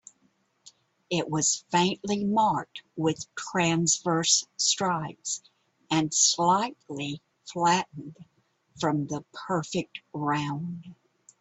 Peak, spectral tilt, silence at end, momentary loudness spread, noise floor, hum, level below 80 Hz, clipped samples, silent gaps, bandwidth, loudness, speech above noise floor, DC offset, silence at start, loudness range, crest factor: -8 dBFS; -3 dB/octave; 0.5 s; 14 LU; -69 dBFS; none; -68 dBFS; under 0.1%; none; 8.4 kHz; -26 LUFS; 42 dB; under 0.1%; 0.65 s; 6 LU; 20 dB